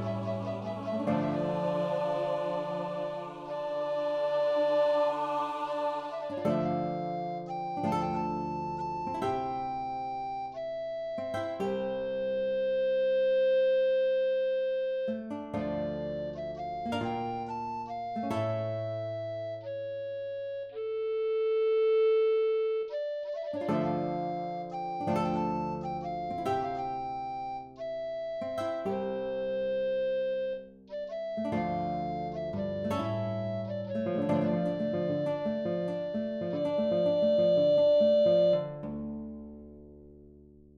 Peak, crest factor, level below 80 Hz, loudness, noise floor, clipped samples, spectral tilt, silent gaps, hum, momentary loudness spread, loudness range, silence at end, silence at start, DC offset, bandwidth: -16 dBFS; 14 dB; -62 dBFS; -31 LUFS; -55 dBFS; under 0.1%; -7.5 dB/octave; none; none; 11 LU; 7 LU; 0.2 s; 0 s; under 0.1%; 9.4 kHz